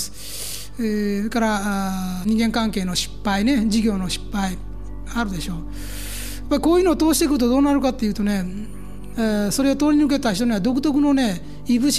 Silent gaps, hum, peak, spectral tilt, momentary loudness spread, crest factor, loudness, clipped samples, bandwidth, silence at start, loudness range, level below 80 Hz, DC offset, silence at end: none; none; -6 dBFS; -4.5 dB/octave; 13 LU; 14 dB; -21 LUFS; under 0.1%; 15.5 kHz; 0 s; 4 LU; -36 dBFS; 2%; 0 s